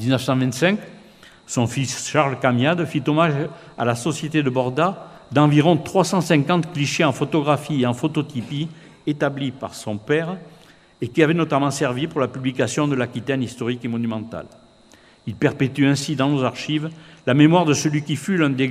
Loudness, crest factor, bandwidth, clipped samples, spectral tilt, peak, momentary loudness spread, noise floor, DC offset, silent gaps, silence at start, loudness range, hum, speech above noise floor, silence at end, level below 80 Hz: -21 LUFS; 20 dB; 15 kHz; under 0.1%; -5.5 dB/octave; 0 dBFS; 11 LU; -51 dBFS; under 0.1%; none; 0 s; 5 LU; none; 31 dB; 0 s; -58 dBFS